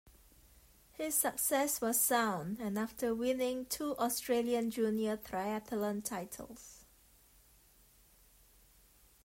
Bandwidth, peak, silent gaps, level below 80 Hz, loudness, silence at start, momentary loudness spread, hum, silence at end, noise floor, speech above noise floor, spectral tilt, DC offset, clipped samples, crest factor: 16 kHz; -16 dBFS; none; -66 dBFS; -34 LUFS; 0.05 s; 13 LU; none; 2.4 s; -65 dBFS; 30 dB; -3 dB/octave; under 0.1%; under 0.1%; 20 dB